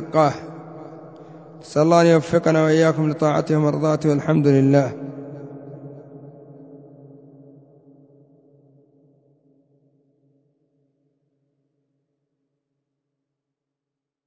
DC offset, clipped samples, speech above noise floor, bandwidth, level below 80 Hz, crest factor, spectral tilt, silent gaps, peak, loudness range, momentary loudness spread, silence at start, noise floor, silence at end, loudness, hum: under 0.1%; under 0.1%; 69 dB; 8 kHz; -62 dBFS; 20 dB; -7.5 dB/octave; none; -2 dBFS; 20 LU; 26 LU; 0 s; -86 dBFS; 7.5 s; -18 LUFS; none